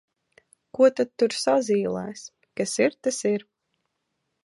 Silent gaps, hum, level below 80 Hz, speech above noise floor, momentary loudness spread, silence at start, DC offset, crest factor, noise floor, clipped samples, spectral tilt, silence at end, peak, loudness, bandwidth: none; none; -72 dBFS; 55 dB; 16 LU; 0.75 s; under 0.1%; 18 dB; -78 dBFS; under 0.1%; -4 dB/octave; 1.05 s; -8 dBFS; -24 LUFS; 11.5 kHz